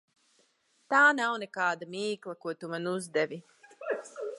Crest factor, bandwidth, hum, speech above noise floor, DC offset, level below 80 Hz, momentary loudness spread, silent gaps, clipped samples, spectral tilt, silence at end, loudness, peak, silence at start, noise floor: 20 dB; 11.5 kHz; none; 40 dB; under 0.1%; -88 dBFS; 16 LU; none; under 0.1%; -4 dB/octave; 0 s; -30 LUFS; -10 dBFS; 0.9 s; -70 dBFS